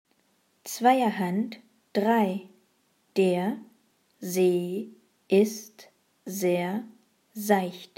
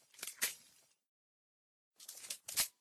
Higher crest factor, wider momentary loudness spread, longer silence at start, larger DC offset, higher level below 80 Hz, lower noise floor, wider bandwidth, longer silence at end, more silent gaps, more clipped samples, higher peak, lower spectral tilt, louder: second, 20 dB vs 26 dB; first, 20 LU vs 17 LU; first, 0.65 s vs 0.15 s; neither; second, -88 dBFS vs -80 dBFS; about the same, -69 dBFS vs -69 dBFS; second, 16.5 kHz vs 19 kHz; about the same, 0.1 s vs 0.1 s; second, none vs 1.09-1.91 s; neither; first, -8 dBFS vs -20 dBFS; first, -5.5 dB/octave vs 2 dB/octave; first, -27 LUFS vs -40 LUFS